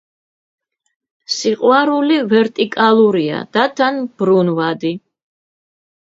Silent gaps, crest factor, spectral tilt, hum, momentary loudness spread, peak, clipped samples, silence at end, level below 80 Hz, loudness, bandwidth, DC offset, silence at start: none; 16 dB; -5.5 dB/octave; none; 7 LU; 0 dBFS; under 0.1%; 1.05 s; -66 dBFS; -15 LUFS; 7.8 kHz; under 0.1%; 1.3 s